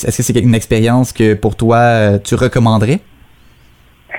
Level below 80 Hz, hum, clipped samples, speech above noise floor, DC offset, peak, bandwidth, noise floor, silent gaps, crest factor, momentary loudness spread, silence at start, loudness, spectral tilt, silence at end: -34 dBFS; none; under 0.1%; 34 dB; 0.9%; 0 dBFS; 17 kHz; -45 dBFS; none; 12 dB; 4 LU; 0 s; -12 LUFS; -6 dB/octave; 0 s